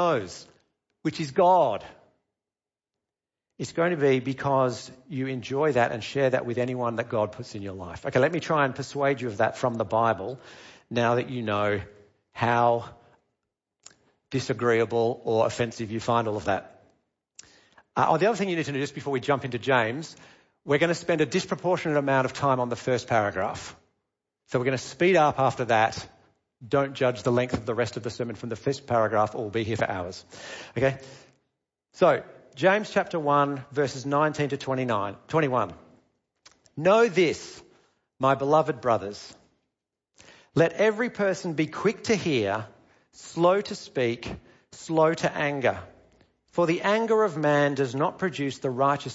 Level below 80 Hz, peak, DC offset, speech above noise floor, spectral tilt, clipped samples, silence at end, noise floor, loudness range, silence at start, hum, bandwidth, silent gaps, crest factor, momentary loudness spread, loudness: -62 dBFS; -8 dBFS; under 0.1%; over 65 dB; -5.5 dB/octave; under 0.1%; 0 s; under -90 dBFS; 3 LU; 0 s; none; 8 kHz; none; 18 dB; 13 LU; -26 LUFS